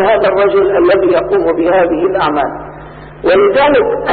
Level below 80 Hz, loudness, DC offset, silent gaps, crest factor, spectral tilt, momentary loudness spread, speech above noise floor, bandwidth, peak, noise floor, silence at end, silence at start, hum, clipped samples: -38 dBFS; -11 LUFS; under 0.1%; none; 8 dB; -11.5 dB/octave; 10 LU; 20 dB; 4.7 kHz; -2 dBFS; -31 dBFS; 0 s; 0 s; none; under 0.1%